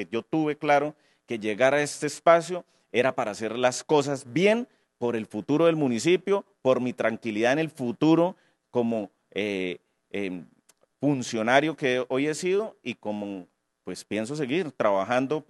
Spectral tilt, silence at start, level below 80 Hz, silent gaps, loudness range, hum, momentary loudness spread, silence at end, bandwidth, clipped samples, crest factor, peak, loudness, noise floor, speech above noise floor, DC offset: -5 dB/octave; 0 s; -78 dBFS; none; 4 LU; none; 12 LU; 0.1 s; 12.5 kHz; under 0.1%; 22 dB; -4 dBFS; -26 LUFS; -56 dBFS; 31 dB; under 0.1%